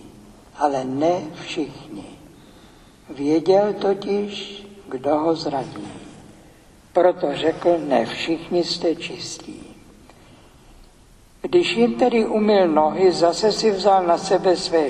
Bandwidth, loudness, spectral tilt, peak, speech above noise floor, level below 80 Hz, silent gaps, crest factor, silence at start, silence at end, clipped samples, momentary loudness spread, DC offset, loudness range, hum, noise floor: 11.5 kHz; -20 LUFS; -5 dB/octave; -2 dBFS; 30 dB; -54 dBFS; none; 18 dB; 0 s; 0 s; under 0.1%; 18 LU; under 0.1%; 8 LU; none; -50 dBFS